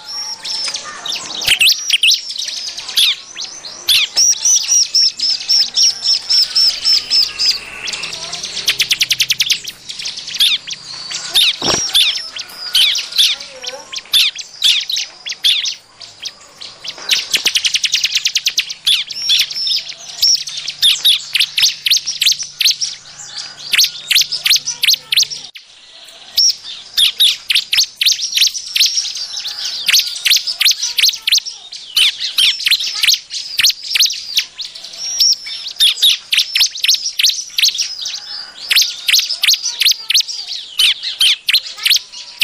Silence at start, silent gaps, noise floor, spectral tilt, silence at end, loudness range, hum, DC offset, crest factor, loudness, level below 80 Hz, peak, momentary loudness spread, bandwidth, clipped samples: 0 s; none; -40 dBFS; 3 dB/octave; 0 s; 3 LU; none; under 0.1%; 14 dB; -12 LUFS; -56 dBFS; 0 dBFS; 14 LU; 16 kHz; under 0.1%